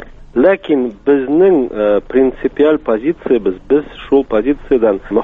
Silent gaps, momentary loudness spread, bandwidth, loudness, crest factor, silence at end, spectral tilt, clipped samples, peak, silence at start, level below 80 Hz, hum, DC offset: none; 5 LU; 3.9 kHz; -14 LUFS; 14 dB; 0 s; -9 dB/octave; under 0.1%; 0 dBFS; 0 s; -38 dBFS; none; under 0.1%